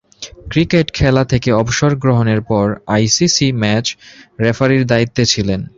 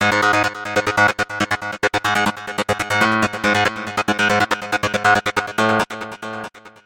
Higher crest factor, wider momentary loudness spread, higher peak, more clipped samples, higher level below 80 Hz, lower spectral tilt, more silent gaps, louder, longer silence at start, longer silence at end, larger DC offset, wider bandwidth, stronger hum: about the same, 14 dB vs 16 dB; second, 6 LU vs 9 LU; about the same, 0 dBFS vs -2 dBFS; neither; first, -36 dBFS vs -50 dBFS; first, -5 dB/octave vs -3.5 dB/octave; neither; first, -14 LUFS vs -18 LUFS; first, 0.2 s vs 0 s; about the same, 0.15 s vs 0.15 s; neither; second, 7.8 kHz vs 17 kHz; neither